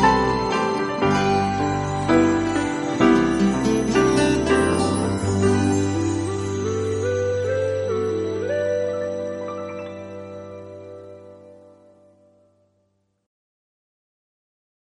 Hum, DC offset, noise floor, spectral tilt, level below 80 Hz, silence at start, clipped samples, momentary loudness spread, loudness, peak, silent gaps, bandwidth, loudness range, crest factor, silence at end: none; under 0.1%; -69 dBFS; -6 dB/octave; -44 dBFS; 0 s; under 0.1%; 18 LU; -21 LUFS; -4 dBFS; none; 11.5 kHz; 16 LU; 18 dB; 3.25 s